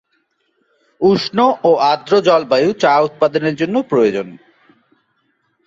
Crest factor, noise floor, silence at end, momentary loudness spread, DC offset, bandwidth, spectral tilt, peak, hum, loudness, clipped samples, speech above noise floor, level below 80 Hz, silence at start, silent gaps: 14 dB; -65 dBFS; 1.35 s; 5 LU; under 0.1%; 7.6 kHz; -6 dB/octave; -2 dBFS; none; -14 LUFS; under 0.1%; 51 dB; -58 dBFS; 1 s; none